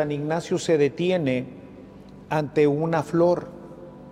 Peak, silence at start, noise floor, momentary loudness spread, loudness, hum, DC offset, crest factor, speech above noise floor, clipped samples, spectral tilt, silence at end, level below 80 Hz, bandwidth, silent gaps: -8 dBFS; 0 s; -44 dBFS; 21 LU; -23 LUFS; none; under 0.1%; 16 dB; 22 dB; under 0.1%; -6.5 dB/octave; 0 s; -58 dBFS; 12.5 kHz; none